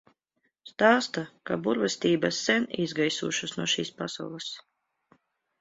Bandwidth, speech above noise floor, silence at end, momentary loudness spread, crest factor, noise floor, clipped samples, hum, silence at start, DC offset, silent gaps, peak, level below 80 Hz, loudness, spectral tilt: 8 kHz; 49 dB; 1 s; 13 LU; 22 dB; -77 dBFS; under 0.1%; none; 0.65 s; under 0.1%; none; -6 dBFS; -70 dBFS; -27 LUFS; -3.5 dB/octave